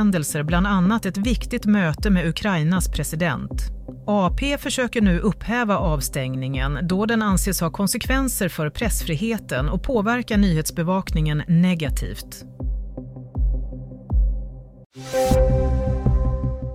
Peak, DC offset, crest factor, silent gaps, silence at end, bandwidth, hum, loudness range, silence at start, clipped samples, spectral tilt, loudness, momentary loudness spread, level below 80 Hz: -6 dBFS; under 0.1%; 14 dB; 14.86-14.90 s; 0 s; 16 kHz; none; 3 LU; 0 s; under 0.1%; -5.5 dB/octave; -22 LUFS; 11 LU; -28 dBFS